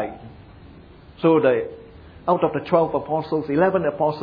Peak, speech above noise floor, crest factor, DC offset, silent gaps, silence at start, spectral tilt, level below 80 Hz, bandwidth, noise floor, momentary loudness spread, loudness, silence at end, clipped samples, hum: -4 dBFS; 25 dB; 18 dB; under 0.1%; none; 0 s; -10 dB/octave; -52 dBFS; 5.2 kHz; -45 dBFS; 12 LU; -21 LUFS; 0 s; under 0.1%; none